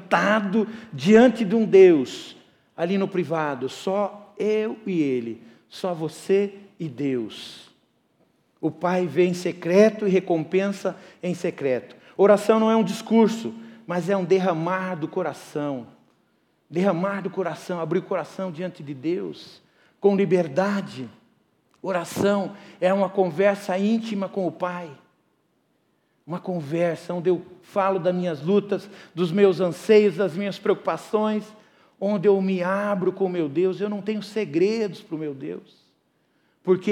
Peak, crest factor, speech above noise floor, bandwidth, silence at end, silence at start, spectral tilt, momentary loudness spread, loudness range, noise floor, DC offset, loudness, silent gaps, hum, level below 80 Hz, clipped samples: -4 dBFS; 18 dB; 45 dB; 13.5 kHz; 0 s; 0 s; -6.5 dB/octave; 15 LU; 7 LU; -68 dBFS; under 0.1%; -23 LUFS; none; none; -72 dBFS; under 0.1%